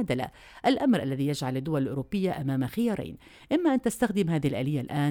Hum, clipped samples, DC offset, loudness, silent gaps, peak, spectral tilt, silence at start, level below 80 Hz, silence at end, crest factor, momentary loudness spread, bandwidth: none; under 0.1%; under 0.1%; -28 LUFS; none; -10 dBFS; -6.5 dB/octave; 0 s; -56 dBFS; 0 s; 16 dB; 6 LU; 18.5 kHz